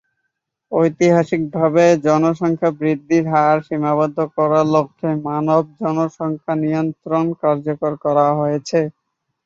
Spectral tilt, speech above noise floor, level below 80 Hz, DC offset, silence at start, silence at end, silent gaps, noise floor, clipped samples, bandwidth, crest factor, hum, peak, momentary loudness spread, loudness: -7.5 dB/octave; 58 dB; -62 dBFS; under 0.1%; 0.7 s; 0.55 s; none; -75 dBFS; under 0.1%; 7.6 kHz; 16 dB; none; -2 dBFS; 7 LU; -18 LUFS